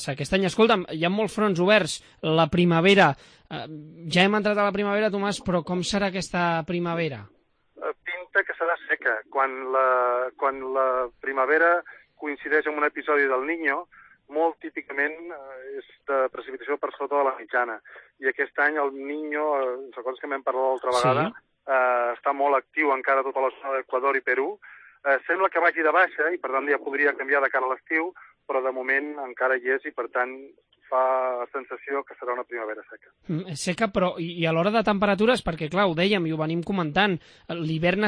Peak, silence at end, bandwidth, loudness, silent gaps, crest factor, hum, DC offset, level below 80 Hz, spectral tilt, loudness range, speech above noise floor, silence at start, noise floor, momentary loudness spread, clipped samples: -6 dBFS; 0 s; 10.5 kHz; -24 LUFS; none; 20 dB; none; under 0.1%; -56 dBFS; -5.5 dB/octave; 6 LU; 23 dB; 0 s; -47 dBFS; 12 LU; under 0.1%